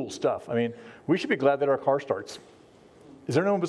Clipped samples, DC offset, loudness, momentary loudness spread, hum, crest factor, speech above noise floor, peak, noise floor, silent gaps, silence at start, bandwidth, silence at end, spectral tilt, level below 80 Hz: under 0.1%; under 0.1%; -27 LUFS; 16 LU; none; 18 dB; 27 dB; -10 dBFS; -53 dBFS; none; 0 s; 11 kHz; 0 s; -6 dB/octave; -72 dBFS